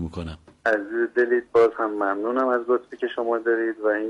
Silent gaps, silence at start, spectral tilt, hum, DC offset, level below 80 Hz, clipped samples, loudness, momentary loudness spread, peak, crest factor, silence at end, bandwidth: none; 0 s; -7 dB/octave; none; under 0.1%; -52 dBFS; under 0.1%; -23 LUFS; 9 LU; -10 dBFS; 14 dB; 0 s; 7.6 kHz